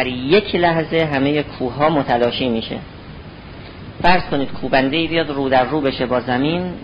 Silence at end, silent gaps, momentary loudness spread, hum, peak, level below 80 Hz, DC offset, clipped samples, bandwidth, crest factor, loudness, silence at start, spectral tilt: 0 s; none; 20 LU; none; -2 dBFS; -40 dBFS; under 0.1%; under 0.1%; 5.4 kHz; 16 dB; -18 LUFS; 0 s; -8.5 dB/octave